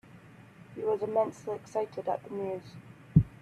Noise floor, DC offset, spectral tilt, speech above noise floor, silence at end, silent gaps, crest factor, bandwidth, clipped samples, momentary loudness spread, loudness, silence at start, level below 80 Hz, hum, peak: -53 dBFS; under 0.1%; -9 dB/octave; 20 dB; 0.05 s; none; 24 dB; 10.5 kHz; under 0.1%; 17 LU; -32 LUFS; 0.15 s; -52 dBFS; none; -8 dBFS